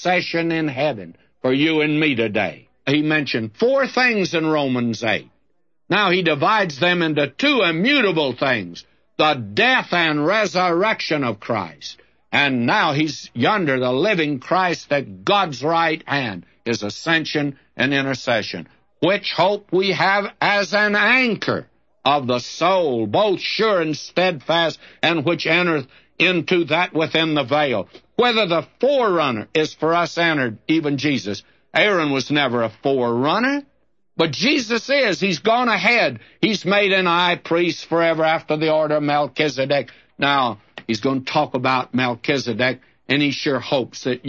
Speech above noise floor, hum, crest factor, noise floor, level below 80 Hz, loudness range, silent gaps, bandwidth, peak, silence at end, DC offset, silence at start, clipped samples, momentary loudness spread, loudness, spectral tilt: 53 dB; none; 16 dB; -72 dBFS; -64 dBFS; 3 LU; none; 7.8 kHz; -4 dBFS; 0 s; under 0.1%; 0 s; under 0.1%; 7 LU; -19 LUFS; -5 dB/octave